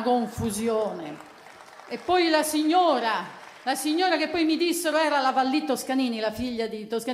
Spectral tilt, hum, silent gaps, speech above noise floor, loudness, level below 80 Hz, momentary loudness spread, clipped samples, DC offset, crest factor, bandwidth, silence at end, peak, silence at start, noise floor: -3.5 dB/octave; none; none; 22 dB; -25 LUFS; -60 dBFS; 12 LU; under 0.1%; under 0.1%; 16 dB; 16 kHz; 0 s; -10 dBFS; 0 s; -47 dBFS